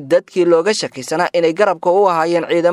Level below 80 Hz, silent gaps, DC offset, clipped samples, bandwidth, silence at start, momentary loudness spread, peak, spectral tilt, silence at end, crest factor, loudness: -66 dBFS; none; under 0.1%; under 0.1%; 12.5 kHz; 0 s; 5 LU; 0 dBFS; -4.5 dB/octave; 0 s; 14 dB; -15 LUFS